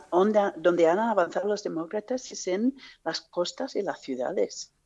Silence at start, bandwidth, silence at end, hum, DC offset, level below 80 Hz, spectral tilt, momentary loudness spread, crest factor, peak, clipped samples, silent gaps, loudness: 0 s; 8.2 kHz; 0.2 s; none; under 0.1%; -72 dBFS; -4.5 dB/octave; 10 LU; 18 dB; -8 dBFS; under 0.1%; none; -27 LUFS